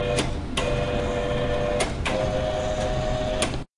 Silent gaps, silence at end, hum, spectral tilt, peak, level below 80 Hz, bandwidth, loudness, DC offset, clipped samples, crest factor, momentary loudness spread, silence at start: none; 0.15 s; none; -5 dB/octave; -8 dBFS; -32 dBFS; 11.5 kHz; -26 LUFS; under 0.1%; under 0.1%; 16 dB; 1 LU; 0 s